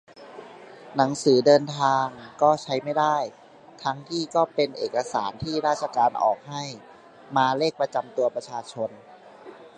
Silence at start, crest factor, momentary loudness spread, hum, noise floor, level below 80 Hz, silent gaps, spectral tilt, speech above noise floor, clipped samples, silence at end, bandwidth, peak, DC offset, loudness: 0.2 s; 20 dB; 15 LU; none; -46 dBFS; -64 dBFS; none; -5 dB/octave; 22 dB; under 0.1%; 0.1 s; 11 kHz; -4 dBFS; under 0.1%; -24 LUFS